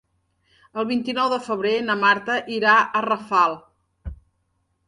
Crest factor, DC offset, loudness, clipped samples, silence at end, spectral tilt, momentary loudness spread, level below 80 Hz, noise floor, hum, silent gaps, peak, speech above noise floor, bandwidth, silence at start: 20 dB; under 0.1%; -20 LUFS; under 0.1%; 0.75 s; -4.5 dB/octave; 22 LU; -48 dBFS; -70 dBFS; none; none; -4 dBFS; 50 dB; 11 kHz; 0.75 s